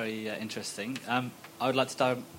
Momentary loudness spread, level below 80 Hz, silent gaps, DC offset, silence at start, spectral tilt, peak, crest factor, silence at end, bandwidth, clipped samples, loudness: 8 LU; -78 dBFS; none; under 0.1%; 0 s; -4 dB/octave; -12 dBFS; 20 dB; 0 s; 16 kHz; under 0.1%; -32 LUFS